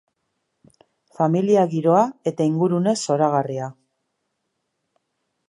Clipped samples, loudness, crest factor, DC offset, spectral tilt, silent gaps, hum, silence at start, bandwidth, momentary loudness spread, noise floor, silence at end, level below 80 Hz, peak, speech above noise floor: under 0.1%; -20 LUFS; 18 dB; under 0.1%; -7 dB/octave; none; none; 1.2 s; 11.5 kHz; 7 LU; -76 dBFS; 1.8 s; -72 dBFS; -4 dBFS; 57 dB